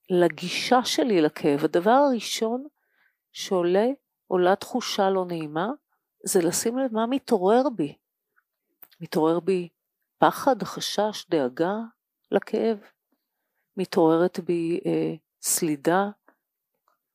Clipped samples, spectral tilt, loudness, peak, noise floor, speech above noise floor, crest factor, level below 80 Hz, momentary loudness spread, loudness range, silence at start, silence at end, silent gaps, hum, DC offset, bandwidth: under 0.1%; -4.5 dB/octave; -24 LUFS; -4 dBFS; -81 dBFS; 58 dB; 22 dB; -76 dBFS; 11 LU; 3 LU; 0.1 s; 1 s; none; none; under 0.1%; 15.5 kHz